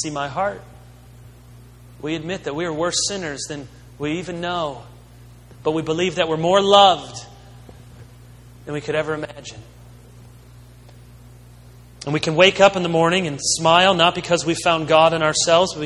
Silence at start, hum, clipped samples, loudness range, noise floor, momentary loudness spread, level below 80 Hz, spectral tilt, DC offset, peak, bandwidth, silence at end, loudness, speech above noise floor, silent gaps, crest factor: 0 s; 60 Hz at -45 dBFS; under 0.1%; 14 LU; -44 dBFS; 19 LU; -50 dBFS; -3.5 dB/octave; under 0.1%; 0 dBFS; 13 kHz; 0 s; -18 LUFS; 25 dB; none; 20 dB